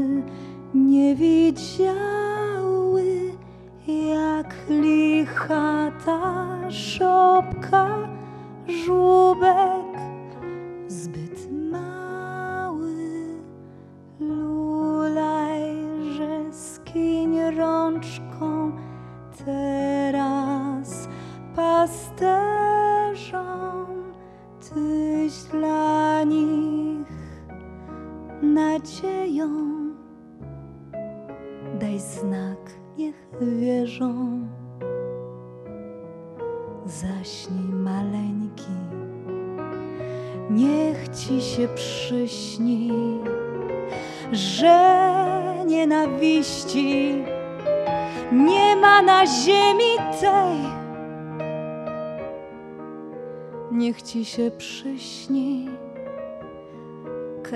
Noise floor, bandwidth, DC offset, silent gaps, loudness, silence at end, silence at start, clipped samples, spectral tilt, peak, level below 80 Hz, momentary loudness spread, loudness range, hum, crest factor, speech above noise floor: -45 dBFS; 12 kHz; under 0.1%; none; -22 LUFS; 0 s; 0 s; under 0.1%; -5 dB/octave; -2 dBFS; -54 dBFS; 19 LU; 12 LU; none; 22 dB; 25 dB